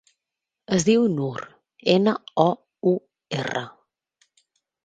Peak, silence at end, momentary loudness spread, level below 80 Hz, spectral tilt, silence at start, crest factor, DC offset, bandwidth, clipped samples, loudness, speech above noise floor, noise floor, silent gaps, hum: -2 dBFS; 1.15 s; 12 LU; -64 dBFS; -5.5 dB/octave; 0.7 s; 22 dB; under 0.1%; 9.4 kHz; under 0.1%; -23 LUFS; 64 dB; -86 dBFS; none; none